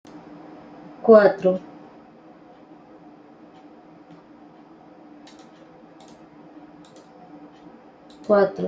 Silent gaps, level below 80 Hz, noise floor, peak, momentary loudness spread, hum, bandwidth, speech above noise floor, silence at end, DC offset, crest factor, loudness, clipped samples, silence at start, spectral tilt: none; -70 dBFS; -48 dBFS; -2 dBFS; 32 LU; none; 7.6 kHz; 32 dB; 0 s; under 0.1%; 24 dB; -18 LUFS; under 0.1%; 1.05 s; -8 dB/octave